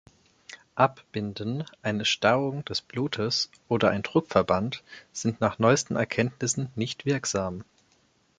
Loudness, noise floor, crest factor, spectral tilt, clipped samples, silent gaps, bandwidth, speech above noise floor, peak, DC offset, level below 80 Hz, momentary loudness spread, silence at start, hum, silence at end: -27 LUFS; -66 dBFS; 22 dB; -4.5 dB/octave; under 0.1%; none; 9.6 kHz; 39 dB; -6 dBFS; under 0.1%; -56 dBFS; 11 LU; 0.5 s; none; 0.75 s